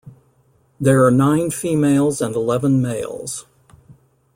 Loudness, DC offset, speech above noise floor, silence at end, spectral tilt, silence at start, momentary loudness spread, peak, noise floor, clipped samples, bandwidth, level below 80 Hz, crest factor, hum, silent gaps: -18 LUFS; under 0.1%; 41 dB; 0.45 s; -6.5 dB/octave; 0.05 s; 13 LU; -2 dBFS; -58 dBFS; under 0.1%; 16.5 kHz; -54 dBFS; 16 dB; none; none